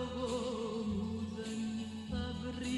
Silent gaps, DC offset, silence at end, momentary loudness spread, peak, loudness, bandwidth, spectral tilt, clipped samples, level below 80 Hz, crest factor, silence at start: none; under 0.1%; 0 s; 3 LU; -26 dBFS; -39 LUFS; 12 kHz; -5.5 dB/octave; under 0.1%; -52 dBFS; 12 dB; 0 s